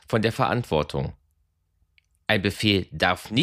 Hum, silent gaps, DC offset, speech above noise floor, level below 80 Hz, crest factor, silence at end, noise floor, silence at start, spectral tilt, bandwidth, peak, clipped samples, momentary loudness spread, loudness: none; none; under 0.1%; 46 dB; -48 dBFS; 20 dB; 0 s; -70 dBFS; 0.1 s; -5.5 dB/octave; 15.5 kHz; -4 dBFS; under 0.1%; 9 LU; -24 LUFS